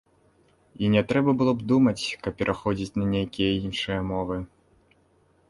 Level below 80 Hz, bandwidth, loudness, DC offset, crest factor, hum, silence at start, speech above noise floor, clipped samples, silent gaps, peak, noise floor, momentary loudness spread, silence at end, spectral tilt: -48 dBFS; 11.5 kHz; -25 LUFS; under 0.1%; 20 dB; none; 0.8 s; 39 dB; under 0.1%; none; -6 dBFS; -63 dBFS; 8 LU; 1.05 s; -6.5 dB/octave